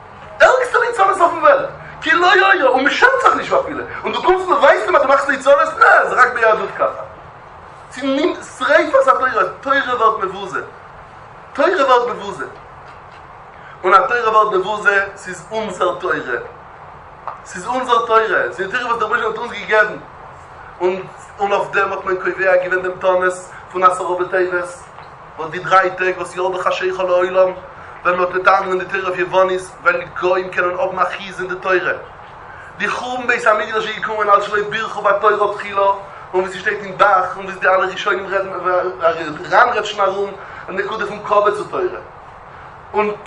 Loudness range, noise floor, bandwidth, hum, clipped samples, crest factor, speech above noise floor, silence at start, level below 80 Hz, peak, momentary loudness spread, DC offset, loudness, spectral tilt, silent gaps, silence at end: 6 LU; -38 dBFS; 11 kHz; none; under 0.1%; 16 dB; 22 dB; 0 s; -52 dBFS; 0 dBFS; 16 LU; under 0.1%; -16 LUFS; -4 dB/octave; none; 0 s